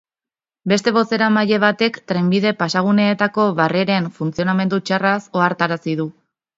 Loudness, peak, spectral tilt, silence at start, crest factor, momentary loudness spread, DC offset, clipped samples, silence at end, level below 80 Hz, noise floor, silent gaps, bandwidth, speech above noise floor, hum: -18 LUFS; 0 dBFS; -6 dB/octave; 0.65 s; 18 dB; 6 LU; under 0.1%; under 0.1%; 0.45 s; -60 dBFS; under -90 dBFS; none; 7.8 kHz; over 73 dB; none